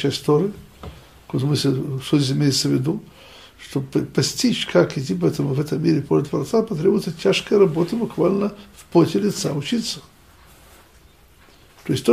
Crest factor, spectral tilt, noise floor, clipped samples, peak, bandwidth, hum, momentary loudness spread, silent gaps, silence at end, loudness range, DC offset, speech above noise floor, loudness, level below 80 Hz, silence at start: 18 dB; -5.5 dB/octave; -51 dBFS; under 0.1%; -4 dBFS; 15.5 kHz; none; 11 LU; none; 0 s; 3 LU; under 0.1%; 31 dB; -21 LUFS; -52 dBFS; 0 s